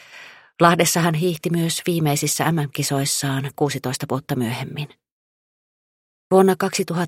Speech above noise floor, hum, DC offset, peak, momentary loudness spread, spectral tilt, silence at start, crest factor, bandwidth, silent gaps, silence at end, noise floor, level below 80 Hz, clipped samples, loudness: 24 dB; none; under 0.1%; 0 dBFS; 11 LU; -4.5 dB/octave; 0.1 s; 20 dB; 16.5 kHz; 5.12-6.30 s; 0 s; -44 dBFS; -60 dBFS; under 0.1%; -20 LUFS